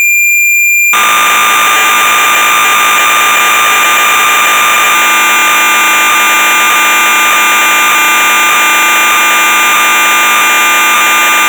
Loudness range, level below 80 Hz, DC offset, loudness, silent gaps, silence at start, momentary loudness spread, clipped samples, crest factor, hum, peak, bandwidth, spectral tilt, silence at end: 0 LU; -60 dBFS; under 0.1%; -5 LUFS; none; 0 s; 1 LU; under 0.1%; 2 dB; none; -4 dBFS; over 20 kHz; 1.5 dB/octave; 0 s